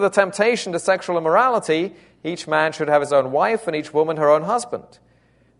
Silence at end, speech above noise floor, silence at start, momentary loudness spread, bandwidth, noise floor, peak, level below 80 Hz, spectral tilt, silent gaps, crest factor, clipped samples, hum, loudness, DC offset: 0.8 s; 38 dB; 0 s; 12 LU; 11 kHz; -57 dBFS; -2 dBFS; -66 dBFS; -4.5 dB/octave; none; 18 dB; under 0.1%; none; -19 LUFS; under 0.1%